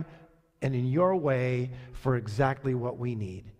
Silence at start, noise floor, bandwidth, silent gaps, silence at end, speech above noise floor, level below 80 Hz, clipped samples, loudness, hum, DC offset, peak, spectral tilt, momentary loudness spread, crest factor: 0 s; -56 dBFS; 9.4 kHz; none; 0.1 s; 27 dB; -54 dBFS; under 0.1%; -29 LUFS; none; under 0.1%; -12 dBFS; -8.5 dB/octave; 10 LU; 16 dB